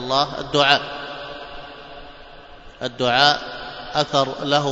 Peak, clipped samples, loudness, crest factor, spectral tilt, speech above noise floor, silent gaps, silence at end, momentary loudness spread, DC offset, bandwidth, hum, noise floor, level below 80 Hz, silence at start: 0 dBFS; under 0.1%; -19 LUFS; 22 dB; -3.5 dB/octave; 22 dB; none; 0 s; 22 LU; under 0.1%; 8 kHz; none; -41 dBFS; -48 dBFS; 0 s